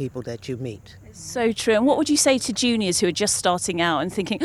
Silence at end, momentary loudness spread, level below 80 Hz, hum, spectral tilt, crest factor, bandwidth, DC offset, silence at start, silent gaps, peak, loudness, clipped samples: 0 s; 14 LU; -54 dBFS; none; -3 dB/octave; 16 dB; 15 kHz; under 0.1%; 0 s; none; -6 dBFS; -21 LUFS; under 0.1%